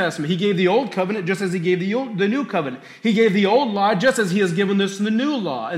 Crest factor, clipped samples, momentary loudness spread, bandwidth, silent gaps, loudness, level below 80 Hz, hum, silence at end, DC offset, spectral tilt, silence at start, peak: 14 dB; under 0.1%; 6 LU; 13.5 kHz; none; -20 LUFS; -68 dBFS; none; 0 s; under 0.1%; -5.5 dB/octave; 0 s; -6 dBFS